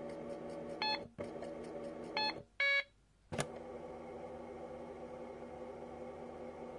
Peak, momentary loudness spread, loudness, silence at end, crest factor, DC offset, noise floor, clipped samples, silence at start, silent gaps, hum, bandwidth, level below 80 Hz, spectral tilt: -20 dBFS; 14 LU; -41 LUFS; 0 s; 24 dB; under 0.1%; -65 dBFS; under 0.1%; 0 s; none; none; 11.5 kHz; -70 dBFS; -3.5 dB/octave